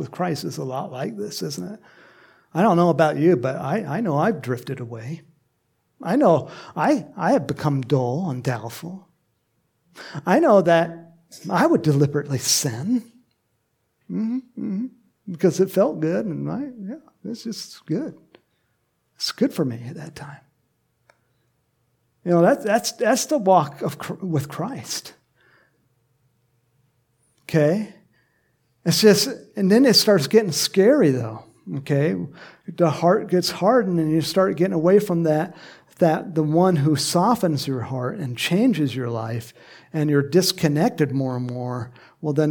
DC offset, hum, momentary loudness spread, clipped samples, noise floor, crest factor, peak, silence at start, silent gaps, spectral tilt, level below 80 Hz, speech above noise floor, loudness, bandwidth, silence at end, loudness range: under 0.1%; none; 17 LU; under 0.1%; -71 dBFS; 20 dB; -2 dBFS; 0 s; none; -5.5 dB/octave; -66 dBFS; 50 dB; -21 LUFS; 19 kHz; 0 s; 10 LU